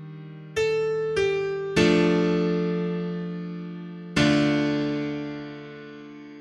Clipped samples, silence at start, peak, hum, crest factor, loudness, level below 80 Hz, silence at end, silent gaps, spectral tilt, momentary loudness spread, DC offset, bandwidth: under 0.1%; 0 s; -6 dBFS; none; 18 dB; -24 LUFS; -52 dBFS; 0 s; none; -6 dB/octave; 20 LU; under 0.1%; 11.5 kHz